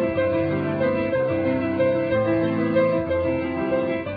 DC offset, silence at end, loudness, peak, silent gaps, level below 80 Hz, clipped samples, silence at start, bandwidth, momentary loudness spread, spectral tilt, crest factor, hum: under 0.1%; 0 s; -22 LUFS; -8 dBFS; none; -48 dBFS; under 0.1%; 0 s; 5 kHz; 3 LU; -10.5 dB/octave; 14 dB; none